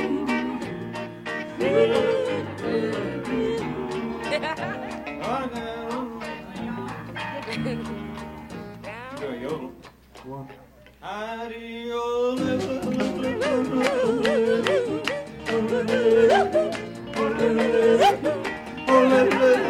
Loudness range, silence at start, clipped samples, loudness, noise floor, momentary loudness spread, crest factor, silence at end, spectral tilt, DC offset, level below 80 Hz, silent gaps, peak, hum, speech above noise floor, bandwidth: 12 LU; 0 s; under 0.1%; -24 LUFS; -47 dBFS; 16 LU; 20 dB; 0 s; -5.5 dB/octave; under 0.1%; -54 dBFS; none; -4 dBFS; none; 24 dB; 15.5 kHz